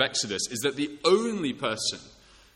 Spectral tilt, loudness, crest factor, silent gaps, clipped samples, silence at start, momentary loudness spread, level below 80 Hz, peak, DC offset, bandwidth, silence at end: -3 dB/octave; -27 LUFS; 20 dB; none; under 0.1%; 0 s; 6 LU; -64 dBFS; -10 dBFS; under 0.1%; 16 kHz; 0.45 s